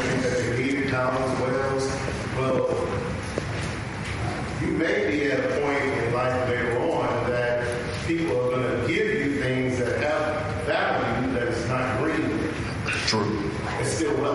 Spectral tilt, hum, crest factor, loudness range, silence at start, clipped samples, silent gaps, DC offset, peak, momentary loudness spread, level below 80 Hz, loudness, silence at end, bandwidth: -5.5 dB/octave; none; 16 dB; 2 LU; 0 s; under 0.1%; none; under 0.1%; -8 dBFS; 5 LU; -44 dBFS; -25 LUFS; 0 s; 11.5 kHz